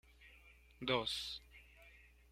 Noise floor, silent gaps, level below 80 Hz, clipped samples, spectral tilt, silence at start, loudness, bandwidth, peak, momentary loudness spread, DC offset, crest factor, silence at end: -64 dBFS; none; -66 dBFS; under 0.1%; -3.5 dB/octave; 0.2 s; -40 LUFS; 16 kHz; -20 dBFS; 25 LU; under 0.1%; 26 dB; 0.25 s